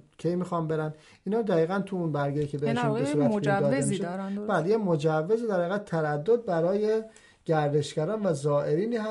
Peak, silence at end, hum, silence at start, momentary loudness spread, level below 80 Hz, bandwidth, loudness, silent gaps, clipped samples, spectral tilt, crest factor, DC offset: -14 dBFS; 0 s; none; 0.2 s; 6 LU; -64 dBFS; 11.5 kHz; -27 LUFS; none; under 0.1%; -7 dB/octave; 14 dB; under 0.1%